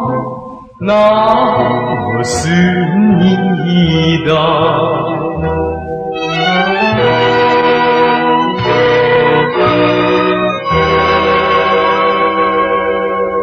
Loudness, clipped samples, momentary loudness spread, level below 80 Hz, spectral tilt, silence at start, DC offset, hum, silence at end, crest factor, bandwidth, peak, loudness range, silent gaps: -11 LUFS; under 0.1%; 7 LU; -38 dBFS; -6 dB/octave; 0 s; under 0.1%; none; 0 s; 12 dB; 10 kHz; 0 dBFS; 2 LU; none